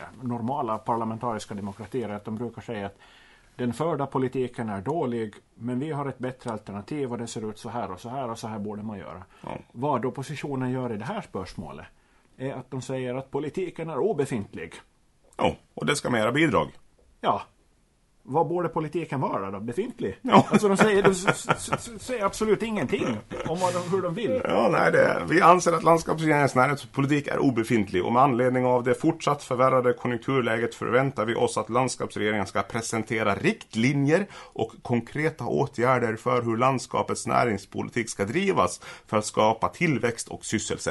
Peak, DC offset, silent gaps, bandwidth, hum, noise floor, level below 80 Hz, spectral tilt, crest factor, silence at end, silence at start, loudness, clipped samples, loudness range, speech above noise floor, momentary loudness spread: -2 dBFS; under 0.1%; none; 11.5 kHz; none; -64 dBFS; -58 dBFS; -5.5 dB/octave; 22 dB; 0 s; 0 s; -26 LUFS; under 0.1%; 11 LU; 38 dB; 13 LU